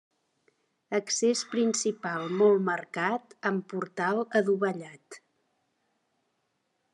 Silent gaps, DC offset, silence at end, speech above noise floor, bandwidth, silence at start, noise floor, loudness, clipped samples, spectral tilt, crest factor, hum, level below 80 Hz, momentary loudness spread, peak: none; under 0.1%; 1.75 s; 49 dB; 11 kHz; 0.9 s; -77 dBFS; -28 LUFS; under 0.1%; -4 dB/octave; 20 dB; none; -86 dBFS; 9 LU; -10 dBFS